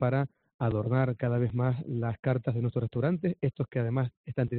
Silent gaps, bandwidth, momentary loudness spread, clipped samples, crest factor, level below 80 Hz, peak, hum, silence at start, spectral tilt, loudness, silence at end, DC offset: 0.54-0.59 s, 2.19-2.23 s, 4.17-4.24 s; 4.3 kHz; 5 LU; under 0.1%; 16 dB; -58 dBFS; -12 dBFS; none; 0 s; -9 dB/octave; -30 LUFS; 0 s; under 0.1%